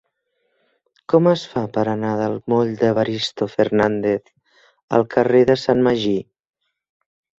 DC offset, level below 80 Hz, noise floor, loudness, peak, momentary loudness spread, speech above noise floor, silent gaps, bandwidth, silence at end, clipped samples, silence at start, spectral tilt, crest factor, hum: under 0.1%; -56 dBFS; -71 dBFS; -19 LUFS; -2 dBFS; 7 LU; 53 dB; 4.83-4.88 s; 8 kHz; 1.15 s; under 0.1%; 1.1 s; -6.5 dB/octave; 18 dB; none